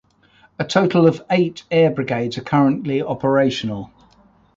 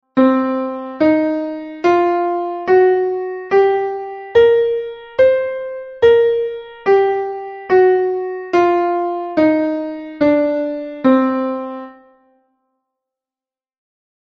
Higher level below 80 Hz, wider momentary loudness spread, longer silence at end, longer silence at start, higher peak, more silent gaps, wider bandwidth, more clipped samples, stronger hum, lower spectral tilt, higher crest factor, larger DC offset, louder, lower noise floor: about the same, -56 dBFS vs -54 dBFS; about the same, 11 LU vs 12 LU; second, 0.7 s vs 2.4 s; first, 0.6 s vs 0.15 s; about the same, -2 dBFS vs 0 dBFS; neither; first, 7.8 kHz vs 6.2 kHz; neither; neither; first, -7 dB/octave vs -4 dB/octave; about the same, 16 dB vs 16 dB; neither; about the same, -18 LUFS vs -16 LUFS; second, -54 dBFS vs under -90 dBFS